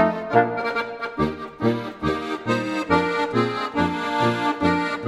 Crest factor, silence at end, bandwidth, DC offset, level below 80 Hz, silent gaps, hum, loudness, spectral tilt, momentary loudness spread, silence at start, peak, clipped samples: 20 dB; 0 s; 13 kHz; under 0.1%; -48 dBFS; none; none; -23 LUFS; -6.5 dB/octave; 6 LU; 0 s; -2 dBFS; under 0.1%